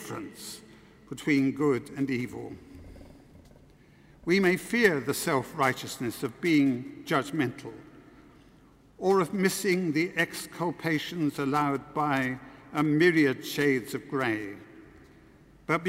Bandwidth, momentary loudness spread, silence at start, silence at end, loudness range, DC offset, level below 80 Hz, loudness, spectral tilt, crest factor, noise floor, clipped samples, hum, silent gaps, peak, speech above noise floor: 16 kHz; 17 LU; 0 s; 0 s; 5 LU; under 0.1%; -62 dBFS; -28 LUFS; -5 dB/octave; 22 dB; -57 dBFS; under 0.1%; none; none; -8 dBFS; 30 dB